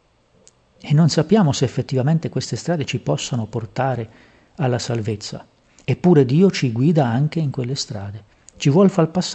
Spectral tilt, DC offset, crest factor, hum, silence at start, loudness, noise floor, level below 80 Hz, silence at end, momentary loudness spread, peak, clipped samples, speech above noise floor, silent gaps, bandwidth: -6.5 dB/octave; under 0.1%; 16 dB; none; 0.85 s; -19 LUFS; -55 dBFS; -56 dBFS; 0 s; 14 LU; -2 dBFS; under 0.1%; 36 dB; none; 8.6 kHz